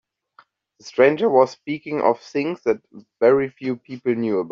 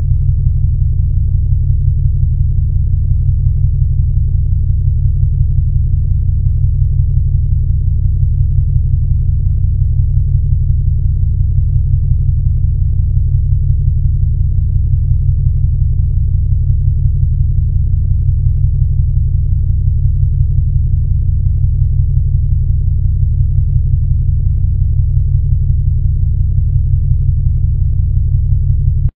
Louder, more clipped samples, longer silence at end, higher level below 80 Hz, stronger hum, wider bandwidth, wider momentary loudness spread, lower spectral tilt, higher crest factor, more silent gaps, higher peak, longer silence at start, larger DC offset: second, -21 LUFS vs -14 LUFS; neither; about the same, 0 s vs 0.1 s; second, -66 dBFS vs -14 dBFS; neither; first, 7.2 kHz vs 0.7 kHz; first, 11 LU vs 1 LU; second, -5 dB/octave vs -14 dB/octave; first, 18 dB vs 10 dB; neither; about the same, -2 dBFS vs 0 dBFS; first, 0.85 s vs 0 s; neither